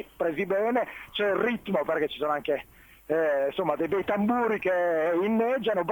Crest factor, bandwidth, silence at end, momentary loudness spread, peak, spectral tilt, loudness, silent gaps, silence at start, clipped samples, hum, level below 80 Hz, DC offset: 14 dB; 18 kHz; 0 s; 4 LU; -12 dBFS; -6.5 dB/octave; -27 LUFS; none; 0 s; under 0.1%; none; -62 dBFS; under 0.1%